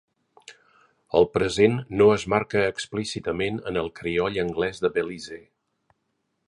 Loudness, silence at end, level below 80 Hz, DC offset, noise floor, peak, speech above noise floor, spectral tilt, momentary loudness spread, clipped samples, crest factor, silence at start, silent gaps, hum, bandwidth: -24 LUFS; 1.1 s; -52 dBFS; under 0.1%; -75 dBFS; -6 dBFS; 52 dB; -5.5 dB/octave; 10 LU; under 0.1%; 20 dB; 0.5 s; none; none; 11 kHz